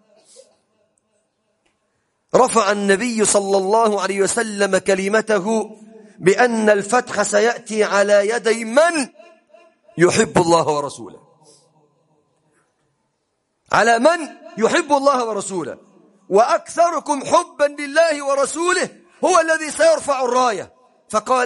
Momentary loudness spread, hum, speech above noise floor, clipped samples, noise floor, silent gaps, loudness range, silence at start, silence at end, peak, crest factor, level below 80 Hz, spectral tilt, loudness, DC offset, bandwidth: 9 LU; none; 54 dB; under 0.1%; -71 dBFS; none; 4 LU; 2.35 s; 0 s; 0 dBFS; 18 dB; -60 dBFS; -3.5 dB/octave; -17 LUFS; under 0.1%; 11.5 kHz